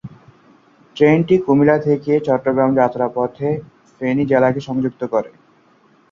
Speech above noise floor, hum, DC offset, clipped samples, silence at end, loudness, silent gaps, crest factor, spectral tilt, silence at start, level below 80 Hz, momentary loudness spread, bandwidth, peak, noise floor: 38 dB; none; under 0.1%; under 0.1%; 0.85 s; -17 LUFS; none; 16 dB; -8.5 dB/octave; 0.05 s; -56 dBFS; 9 LU; 7.2 kHz; -2 dBFS; -54 dBFS